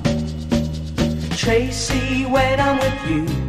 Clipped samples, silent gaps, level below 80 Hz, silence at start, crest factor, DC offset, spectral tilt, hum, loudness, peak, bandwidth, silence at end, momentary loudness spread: under 0.1%; none; -30 dBFS; 0 s; 16 dB; under 0.1%; -5 dB/octave; none; -20 LUFS; -4 dBFS; 15.5 kHz; 0 s; 5 LU